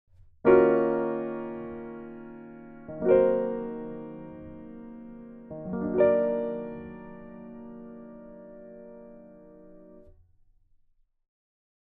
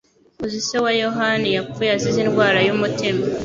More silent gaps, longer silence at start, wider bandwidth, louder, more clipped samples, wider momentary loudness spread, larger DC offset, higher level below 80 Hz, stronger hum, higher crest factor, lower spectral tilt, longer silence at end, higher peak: neither; about the same, 0.45 s vs 0.4 s; second, 3.8 kHz vs 7.8 kHz; second, -26 LUFS vs -19 LUFS; neither; first, 25 LU vs 7 LU; neither; about the same, -58 dBFS vs -54 dBFS; neither; first, 22 dB vs 16 dB; first, -11 dB/octave vs -4.5 dB/octave; first, 1.95 s vs 0 s; second, -8 dBFS vs -4 dBFS